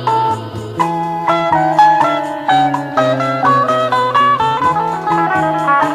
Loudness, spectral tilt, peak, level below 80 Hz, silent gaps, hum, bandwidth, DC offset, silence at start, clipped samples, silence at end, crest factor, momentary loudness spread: -13 LUFS; -5.5 dB/octave; 0 dBFS; -50 dBFS; none; none; 14 kHz; under 0.1%; 0 s; under 0.1%; 0 s; 14 dB; 7 LU